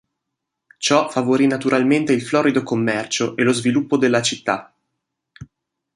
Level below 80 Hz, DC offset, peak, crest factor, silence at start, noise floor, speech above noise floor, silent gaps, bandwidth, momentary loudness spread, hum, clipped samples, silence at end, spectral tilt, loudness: -62 dBFS; under 0.1%; -2 dBFS; 18 dB; 0.8 s; -80 dBFS; 62 dB; none; 11.5 kHz; 5 LU; none; under 0.1%; 0.5 s; -4.5 dB/octave; -18 LUFS